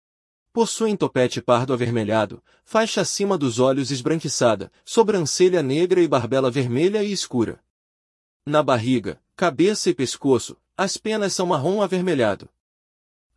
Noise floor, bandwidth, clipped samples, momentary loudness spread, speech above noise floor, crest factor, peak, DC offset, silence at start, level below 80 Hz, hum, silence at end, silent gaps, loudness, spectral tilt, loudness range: under -90 dBFS; 12 kHz; under 0.1%; 6 LU; over 69 dB; 18 dB; -4 dBFS; under 0.1%; 0.55 s; -64 dBFS; none; 0.95 s; 7.70-8.40 s; -21 LUFS; -5 dB/octave; 3 LU